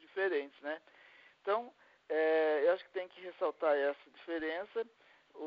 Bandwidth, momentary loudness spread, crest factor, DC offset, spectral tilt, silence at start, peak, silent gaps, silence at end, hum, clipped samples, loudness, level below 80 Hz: 5.4 kHz; 15 LU; 18 dB; under 0.1%; -0.5 dB/octave; 0.15 s; -18 dBFS; none; 0 s; none; under 0.1%; -35 LUFS; -84 dBFS